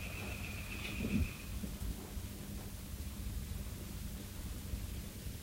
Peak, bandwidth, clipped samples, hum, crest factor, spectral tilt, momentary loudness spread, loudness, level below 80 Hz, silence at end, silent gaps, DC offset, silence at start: -24 dBFS; 16 kHz; under 0.1%; none; 18 dB; -5 dB/octave; 8 LU; -43 LUFS; -46 dBFS; 0 s; none; under 0.1%; 0 s